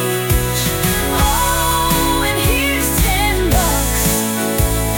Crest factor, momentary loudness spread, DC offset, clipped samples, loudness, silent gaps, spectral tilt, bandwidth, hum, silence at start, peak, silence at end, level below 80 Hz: 14 dB; 2 LU; 0.1%; under 0.1%; -15 LUFS; none; -3.5 dB/octave; 19.5 kHz; none; 0 s; 0 dBFS; 0 s; -22 dBFS